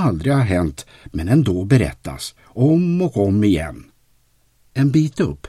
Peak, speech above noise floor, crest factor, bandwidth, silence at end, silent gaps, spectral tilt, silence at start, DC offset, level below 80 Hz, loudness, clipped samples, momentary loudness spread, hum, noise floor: -2 dBFS; 41 dB; 16 dB; 13 kHz; 0.15 s; none; -7.5 dB/octave; 0 s; under 0.1%; -38 dBFS; -18 LUFS; under 0.1%; 14 LU; none; -58 dBFS